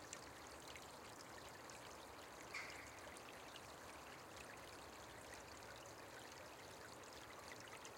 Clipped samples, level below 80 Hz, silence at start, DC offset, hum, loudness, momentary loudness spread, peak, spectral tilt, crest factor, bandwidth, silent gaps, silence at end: under 0.1%; -76 dBFS; 0 s; under 0.1%; none; -55 LUFS; 4 LU; -34 dBFS; -2.5 dB/octave; 22 dB; 16.5 kHz; none; 0 s